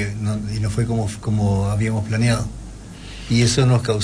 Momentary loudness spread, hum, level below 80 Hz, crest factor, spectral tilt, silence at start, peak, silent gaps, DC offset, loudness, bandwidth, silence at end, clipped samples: 19 LU; none; -36 dBFS; 16 dB; -5.5 dB/octave; 0 s; -4 dBFS; none; under 0.1%; -20 LUFS; 10.5 kHz; 0 s; under 0.1%